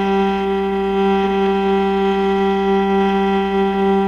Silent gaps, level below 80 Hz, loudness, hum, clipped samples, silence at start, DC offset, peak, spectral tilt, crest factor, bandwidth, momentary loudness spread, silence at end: none; -40 dBFS; -17 LUFS; none; under 0.1%; 0 s; under 0.1%; -6 dBFS; -7.5 dB/octave; 10 dB; 6.8 kHz; 2 LU; 0 s